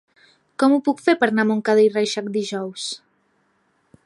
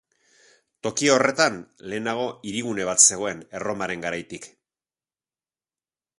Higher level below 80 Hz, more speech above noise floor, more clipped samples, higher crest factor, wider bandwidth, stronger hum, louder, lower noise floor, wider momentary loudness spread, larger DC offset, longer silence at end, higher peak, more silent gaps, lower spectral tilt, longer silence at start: second, -72 dBFS vs -64 dBFS; second, 46 dB vs over 66 dB; neither; second, 18 dB vs 24 dB; about the same, 11.5 kHz vs 11.5 kHz; neither; about the same, -20 LUFS vs -22 LUFS; second, -65 dBFS vs under -90 dBFS; second, 13 LU vs 17 LU; neither; second, 1.1 s vs 1.7 s; about the same, -4 dBFS vs -2 dBFS; neither; first, -4.5 dB/octave vs -2 dB/octave; second, 0.6 s vs 0.85 s